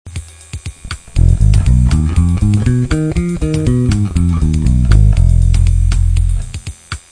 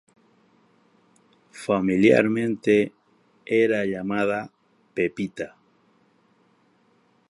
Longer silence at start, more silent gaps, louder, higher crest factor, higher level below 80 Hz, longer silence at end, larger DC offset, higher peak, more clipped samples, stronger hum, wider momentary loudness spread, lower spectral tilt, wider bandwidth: second, 0.05 s vs 1.55 s; neither; first, -13 LUFS vs -23 LUFS; second, 12 dB vs 22 dB; first, -14 dBFS vs -64 dBFS; second, 0.15 s vs 1.85 s; neither; first, 0 dBFS vs -4 dBFS; neither; neither; about the same, 17 LU vs 17 LU; about the same, -7 dB/octave vs -6.5 dB/octave; about the same, 10.5 kHz vs 11.5 kHz